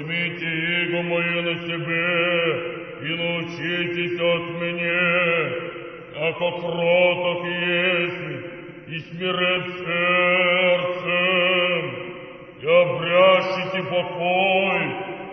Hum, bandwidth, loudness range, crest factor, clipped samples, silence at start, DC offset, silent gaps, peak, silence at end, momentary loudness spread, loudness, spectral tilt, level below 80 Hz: none; 6.2 kHz; 3 LU; 18 dB; under 0.1%; 0 s; under 0.1%; none; -4 dBFS; 0 s; 14 LU; -21 LUFS; -6.5 dB/octave; -62 dBFS